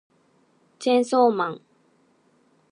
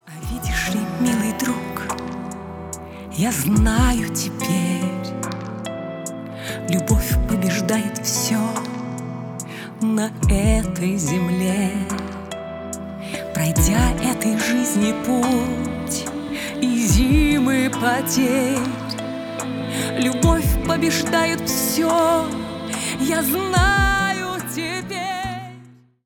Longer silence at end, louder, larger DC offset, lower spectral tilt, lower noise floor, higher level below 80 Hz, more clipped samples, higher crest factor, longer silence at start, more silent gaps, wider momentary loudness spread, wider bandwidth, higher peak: first, 1.15 s vs 0.35 s; about the same, -22 LUFS vs -21 LUFS; neither; about the same, -5 dB/octave vs -4.5 dB/octave; first, -63 dBFS vs -46 dBFS; second, -84 dBFS vs -30 dBFS; neither; about the same, 20 dB vs 18 dB; first, 0.8 s vs 0.05 s; neither; about the same, 11 LU vs 13 LU; second, 11 kHz vs over 20 kHz; about the same, -6 dBFS vs -4 dBFS